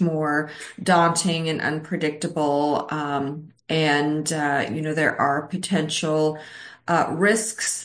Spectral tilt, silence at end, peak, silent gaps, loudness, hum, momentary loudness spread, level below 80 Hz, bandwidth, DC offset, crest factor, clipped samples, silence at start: -4 dB/octave; 0 s; -6 dBFS; none; -22 LUFS; none; 7 LU; -66 dBFS; 10.5 kHz; under 0.1%; 16 dB; under 0.1%; 0 s